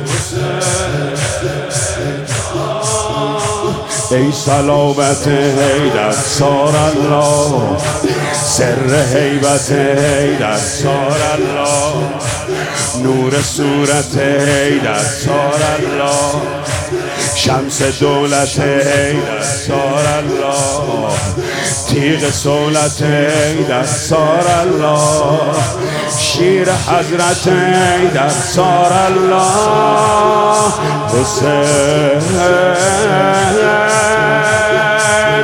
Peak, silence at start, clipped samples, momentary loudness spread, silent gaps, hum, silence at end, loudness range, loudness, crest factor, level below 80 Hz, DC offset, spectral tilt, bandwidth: 0 dBFS; 0 s; under 0.1%; 6 LU; none; none; 0 s; 3 LU; -13 LUFS; 12 dB; -40 dBFS; under 0.1%; -4 dB/octave; 18 kHz